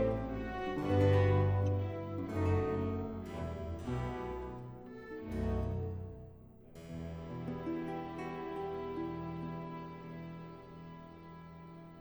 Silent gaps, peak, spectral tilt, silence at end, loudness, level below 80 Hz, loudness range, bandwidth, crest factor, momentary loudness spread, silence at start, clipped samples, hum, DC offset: none; -18 dBFS; -8.5 dB/octave; 0 s; -37 LUFS; -52 dBFS; 10 LU; over 20 kHz; 18 dB; 21 LU; 0 s; under 0.1%; none; under 0.1%